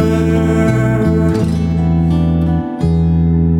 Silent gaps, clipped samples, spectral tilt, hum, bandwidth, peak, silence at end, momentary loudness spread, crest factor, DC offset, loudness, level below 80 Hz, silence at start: none; under 0.1%; -8.5 dB/octave; none; 10 kHz; -2 dBFS; 0 s; 2 LU; 10 dB; under 0.1%; -14 LUFS; -24 dBFS; 0 s